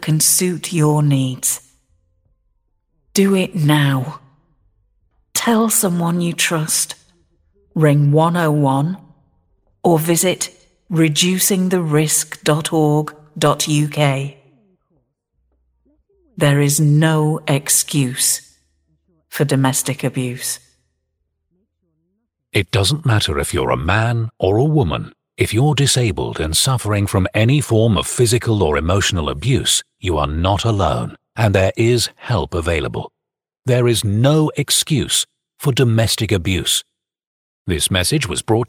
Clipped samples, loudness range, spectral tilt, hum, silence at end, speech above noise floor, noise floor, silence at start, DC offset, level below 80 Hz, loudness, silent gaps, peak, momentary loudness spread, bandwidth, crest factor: under 0.1%; 4 LU; -4.5 dB/octave; none; 0.05 s; 55 dB; -71 dBFS; 0 s; under 0.1%; -38 dBFS; -16 LUFS; 37.27-37.65 s; 0 dBFS; 8 LU; 18 kHz; 18 dB